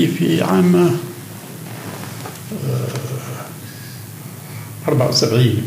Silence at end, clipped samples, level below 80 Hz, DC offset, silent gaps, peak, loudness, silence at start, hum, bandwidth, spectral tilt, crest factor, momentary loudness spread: 0 s; under 0.1%; -66 dBFS; under 0.1%; none; -2 dBFS; -18 LUFS; 0 s; none; 16 kHz; -6 dB/octave; 16 dB; 19 LU